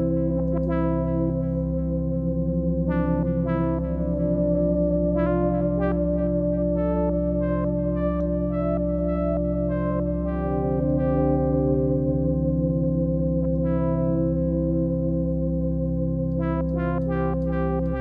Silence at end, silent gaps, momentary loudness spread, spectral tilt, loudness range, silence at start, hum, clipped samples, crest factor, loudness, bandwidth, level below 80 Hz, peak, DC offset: 0 s; none; 3 LU; -12.5 dB/octave; 2 LU; 0 s; none; under 0.1%; 12 dB; -24 LUFS; 3.3 kHz; -32 dBFS; -10 dBFS; under 0.1%